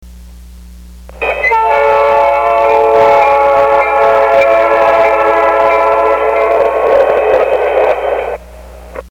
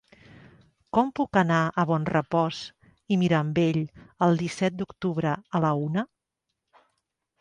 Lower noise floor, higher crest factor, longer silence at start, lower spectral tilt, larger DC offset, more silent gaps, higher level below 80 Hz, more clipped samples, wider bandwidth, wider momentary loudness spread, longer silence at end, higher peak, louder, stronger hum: second, -32 dBFS vs -83 dBFS; second, 10 dB vs 18 dB; second, 0 s vs 0.95 s; second, -5 dB/octave vs -7 dB/octave; neither; neither; first, -36 dBFS vs -60 dBFS; neither; first, 17 kHz vs 10 kHz; about the same, 7 LU vs 8 LU; second, 0 s vs 1.35 s; first, 0 dBFS vs -8 dBFS; first, -9 LUFS vs -26 LUFS; neither